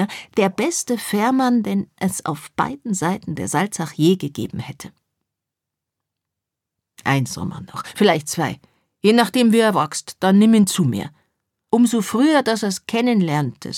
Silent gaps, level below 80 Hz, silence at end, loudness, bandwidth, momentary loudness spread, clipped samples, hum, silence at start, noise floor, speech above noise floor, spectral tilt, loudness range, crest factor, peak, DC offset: none; -60 dBFS; 0 s; -19 LUFS; 16.5 kHz; 13 LU; under 0.1%; none; 0 s; -84 dBFS; 65 dB; -5 dB/octave; 9 LU; 18 dB; -2 dBFS; under 0.1%